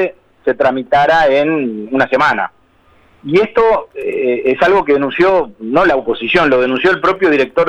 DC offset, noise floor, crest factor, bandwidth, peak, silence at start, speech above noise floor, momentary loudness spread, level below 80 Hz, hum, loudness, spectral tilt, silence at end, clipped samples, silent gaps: under 0.1%; -50 dBFS; 12 dB; 8.8 kHz; 0 dBFS; 0 s; 37 dB; 7 LU; -44 dBFS; none; -13 LUFS; -6 dB/octave; 0 s; under 0.1%; none